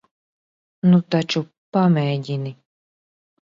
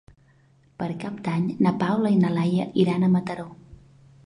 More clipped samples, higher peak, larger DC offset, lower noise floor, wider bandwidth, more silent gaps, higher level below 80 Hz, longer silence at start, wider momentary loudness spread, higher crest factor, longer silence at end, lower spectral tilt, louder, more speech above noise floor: neither; about the same, -6 dBFS vs -8 dBFS; neither; first, under -90 dBFS vs -58 dBFS; second, 7.6 kHz vs 10.5 kHz; first, 1.58-1.72 s vs none; second, -66 dBFS vs -60 dBFS; about the same, 0.85 s vs 0.8 s; about the same, 11 LU vs 13 LU; about the same, 16 dB vs 16 dB; first, 0.9 s vs 0.55 s; about the same, -7.5 dB/octave vs -8.5 dB/octave; first, -20 LUFS vs -23 LUFS; first, over 71 dB vs 36 dB